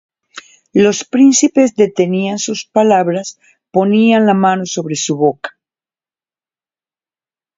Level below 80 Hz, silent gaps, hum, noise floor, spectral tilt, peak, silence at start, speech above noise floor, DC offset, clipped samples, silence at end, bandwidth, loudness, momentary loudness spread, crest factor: -60 dBFS; none; none; under -90 dBFS; -4.5 dB/octave; 0 dBFS; 0.35 s; over 78 dB; under 0.1%; under 0.1%; 2.1 s; 7.8 kHz; -13 LUFS; 9 LU; 14 dB